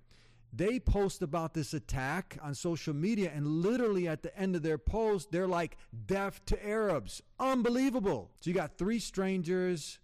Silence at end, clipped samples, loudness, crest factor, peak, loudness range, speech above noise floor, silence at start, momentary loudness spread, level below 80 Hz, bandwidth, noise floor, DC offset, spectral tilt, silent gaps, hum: 0.05 s; under 0.1%; -34 LUFS; 12 dB; -22 dBFS; 1 LU; 28 dB; 0.5 s; 7 LU; -46 dBFS; 15 kHz; -60 dBFS; under 0.1%; -6 dB/octave; none; none